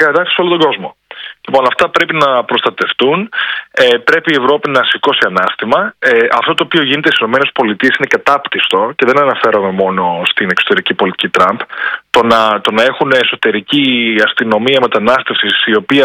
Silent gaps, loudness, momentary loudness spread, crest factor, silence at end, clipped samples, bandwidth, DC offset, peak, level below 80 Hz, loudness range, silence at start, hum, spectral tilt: none; -11 LUFS; 4 LU; 12 dB; 0 s; 0.7%; 15.5 kHz; under 0.1%; 0 dBFS; -54 dBFS; 1 LU; 0 s; none; -4.5 dB/octave